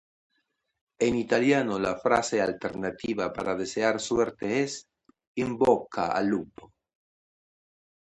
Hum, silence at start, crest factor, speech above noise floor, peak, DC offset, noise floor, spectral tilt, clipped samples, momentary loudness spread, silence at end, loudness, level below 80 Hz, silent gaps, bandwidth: none; 1 s; 22 dB; 50 dB; -8 dBFS; under 0.1%; -77 dBFS; -5 dB/octave; under 0.1%; 9 LU; 1.35 s; -27 LUFS; -60 dBFS; 5.27-5.35 s; 11 kHz